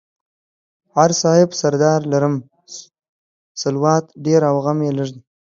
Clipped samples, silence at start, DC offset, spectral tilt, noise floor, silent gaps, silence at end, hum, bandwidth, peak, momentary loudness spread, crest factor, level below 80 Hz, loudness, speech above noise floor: under 0.1%; 0.95 s; under 0.1%; -5.5 dB/octave; -40 dBFS; 3.09-3.55 s; 0.4 s; none; 7.6 kHz; 0 dBFS; 20 LU; 18 dB; -64 dBFS; -17 LUFS; 24 dB